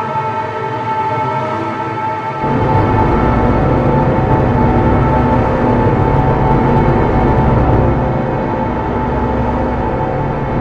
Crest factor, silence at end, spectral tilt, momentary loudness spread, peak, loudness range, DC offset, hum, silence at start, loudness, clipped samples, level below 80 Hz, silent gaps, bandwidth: 12 dB; 0 s; -9.5 dB/octave; 6 LU; 0 dBFS; 3 LU; under 0.1%; none; 0 s; -14 LUFS; under 0.1%; -22 dBFS; none; 7.2 kHz